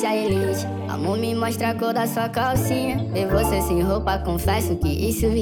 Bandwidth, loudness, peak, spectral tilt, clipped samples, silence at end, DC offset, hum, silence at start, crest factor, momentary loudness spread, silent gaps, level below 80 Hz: 20 kHz; -22 LUFS; -6 dBFS; -5.5 dB/octave; under 0.1%; 0 s; under 0.1%; none; 0 s; 16 dB; 3 LU; none; -32 dBFS